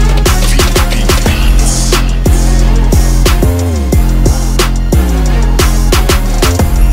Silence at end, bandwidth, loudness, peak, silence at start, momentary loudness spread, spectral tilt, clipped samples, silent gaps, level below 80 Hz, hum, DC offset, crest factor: 0 s; 16.5 kHz; -11 LUFS; 0 dBFS; 0 s; 2 LU; -4.5 dB/octave; 0.1%; none; -8 dBFS; none; under 0.1%; 8 dB